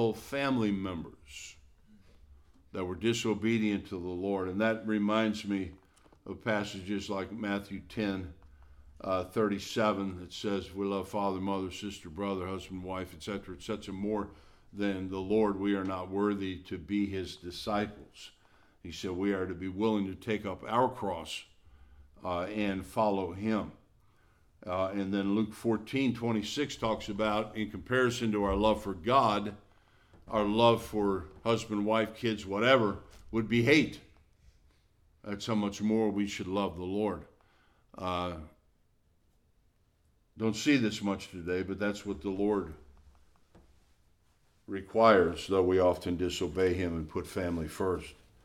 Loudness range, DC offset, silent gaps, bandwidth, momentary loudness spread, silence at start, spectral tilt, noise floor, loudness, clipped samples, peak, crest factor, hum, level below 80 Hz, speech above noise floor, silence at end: 7 LU; under 0.1%; none; 15.5 kHz; 14 LU; 0 s; -5.5 dB/octave; -69 dBFS; -32 LUFS; under 0.1%; -10 dBFS; 24 dB; none; -56 dBFS; 38 dB; 0.3 s